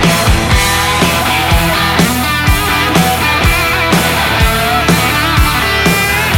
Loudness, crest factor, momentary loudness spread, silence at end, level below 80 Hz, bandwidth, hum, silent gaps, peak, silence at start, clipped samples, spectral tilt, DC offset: -10 LUFS; 10 dB; 1 LU; 0 s; -20 dBFS; 18 kHz; none; none; 0 dBFS; 0 s; under 0.1%; -4 dB/octave; under 0.1%